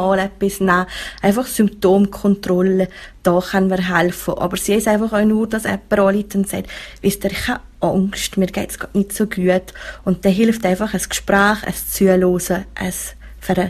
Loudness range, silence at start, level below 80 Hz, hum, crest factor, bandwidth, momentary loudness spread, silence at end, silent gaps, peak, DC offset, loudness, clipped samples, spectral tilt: 3 LU; 0 s; -40 dBFS; none; 18 dB; 15 kHz; 8 LU; 0 s; none; 0 dBFS; under 0.1%; -18 LUFS; under 0.1%; -5 dB/octave